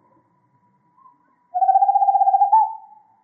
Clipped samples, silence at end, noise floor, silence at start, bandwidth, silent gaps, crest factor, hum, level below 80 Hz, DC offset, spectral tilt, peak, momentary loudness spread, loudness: under 0.1%; 0.45 s; -62 dBFS; 1.55 s; 1.9 kHz; none; 14 dB; none; under -90 dBFS; under 0.1%; -5.5 dB/octave; -6 dBFS; 12 LU; -17 LUFS